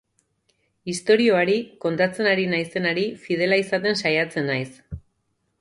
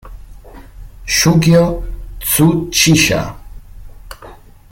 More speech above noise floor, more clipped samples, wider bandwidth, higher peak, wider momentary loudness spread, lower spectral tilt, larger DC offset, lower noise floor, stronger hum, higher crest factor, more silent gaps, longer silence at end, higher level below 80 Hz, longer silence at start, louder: first, 50 dB vs 26 dB; neither; second, 11.5 kHz vs 17 kHz; second, -6 dBFS vs 0 dBFS; second, 15 LU vs 19 LU; about the same, -5 dB/octave vs -4 dB/octave; neither; first, -72 dBFS vs -37 dBFS; neither; about the same, 18 dB vs 16 dB; neither; first, 0.6 s vs 0.35 s; second, -54 dBFS vs -32 dBFS; first, 0.85 s vs 0.05 s; second, -22 LUFS vs -12 LUFS